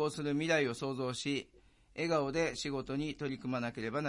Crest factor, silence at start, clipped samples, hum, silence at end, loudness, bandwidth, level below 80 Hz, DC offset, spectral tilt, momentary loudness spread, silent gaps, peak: 18 dB; 0 s; under 0.1%; none; 0 s; -35 LUFS; 11.5 kHz; -62 dBFS; under 0.1%; -5 dB/octave; 8 LU; none; -18 dBFS